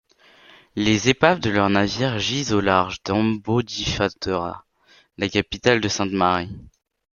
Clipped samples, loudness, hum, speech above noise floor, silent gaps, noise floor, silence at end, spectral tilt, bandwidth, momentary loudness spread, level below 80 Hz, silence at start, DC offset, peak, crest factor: under 0.1%; -21 LUFS; none; 36 dB; none; -57 dBFS; 0.5 s; -4.5 dB/octave; 7.4 kHz; 9 LU; -48 dBFS; 0.75 s; under 0.1%; -2 dBFS; 20 dB